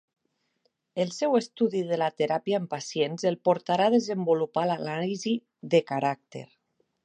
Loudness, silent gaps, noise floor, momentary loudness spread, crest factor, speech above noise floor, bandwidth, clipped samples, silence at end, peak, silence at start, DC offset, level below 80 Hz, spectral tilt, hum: -27 LUFS; none; -74 dBFS; 8 LU; 18 dB; 48 dB; 9.6 kHz; under 0.1%; 0.6 s; -8 dBFS; 0.95 s; under 0.1%; -78 dBFS; -5.5 dB/octave; none